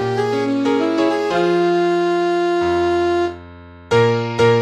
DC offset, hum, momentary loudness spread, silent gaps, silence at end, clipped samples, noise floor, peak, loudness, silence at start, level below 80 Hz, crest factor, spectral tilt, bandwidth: under 0.1%; none; 3 LU; none; 0 s; under 0.1%; -38 dBFS; -4 dBFS; -17 LUFS; 0 s; -50 dBFS; 14 dB; -6.5 dB/octave; 10 kHz